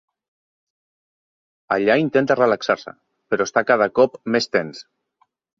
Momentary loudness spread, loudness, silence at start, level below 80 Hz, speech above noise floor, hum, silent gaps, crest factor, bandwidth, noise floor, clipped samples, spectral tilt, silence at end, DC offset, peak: 9 LU; -19 LUFS; 1.7 s; -64 dBFS; 47 dB; none; none; 20 dB; 7.6 kHz; -66 dBFS; under 0.1%; -5 dB/octave; 0.75 s; under 0.1%; -2 dBFS